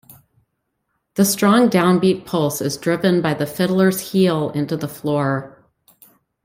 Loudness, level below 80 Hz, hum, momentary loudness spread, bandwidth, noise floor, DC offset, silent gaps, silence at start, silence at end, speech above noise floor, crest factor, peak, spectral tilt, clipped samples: -18 LUFS; -58 dBFS; none; 9 LU; 16.5 kHz; -73 dBFS; under 0.1%; none; 0.1 s; 0.95 s; 56 dB; 18 dB; -2 dBFS; -5.5 dB/octave; under 0.1%